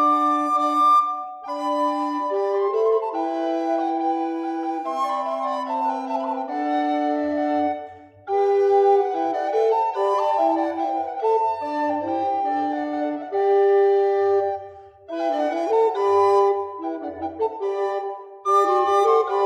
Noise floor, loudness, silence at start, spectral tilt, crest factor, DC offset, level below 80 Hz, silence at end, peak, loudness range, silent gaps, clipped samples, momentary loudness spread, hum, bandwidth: -41 dBFS; -22 LUFS; 0 s; -5 dB/octave; 14 dB; under 0.1%; -68 dBFS; 0 s; -8 dBFS; 4 LU; none; under 0.1%; 9 LU; none; 10 kHz